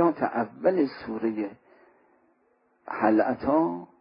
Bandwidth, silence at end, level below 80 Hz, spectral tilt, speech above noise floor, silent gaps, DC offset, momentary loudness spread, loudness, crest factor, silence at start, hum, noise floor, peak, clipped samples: 5.4 kHz; 0.15 s; -64 dBFS; -11 dB/octave; 41 dB; none; under 0.1%; 9 LU; -26 LUFS; 20 dB; 0 s; none; -67 dBFS; -8 dBFS; under 0.1%